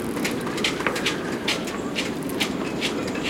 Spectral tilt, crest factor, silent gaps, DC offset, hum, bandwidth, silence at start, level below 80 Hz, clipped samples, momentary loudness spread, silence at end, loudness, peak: -3.5 dB/octave; 24 dB; none; under 0.1%; none; 17 kHz; 0 s; -52 dBFS; under 0.1%; 3 LU; 0 s; -25 LUFS; -2 dBFS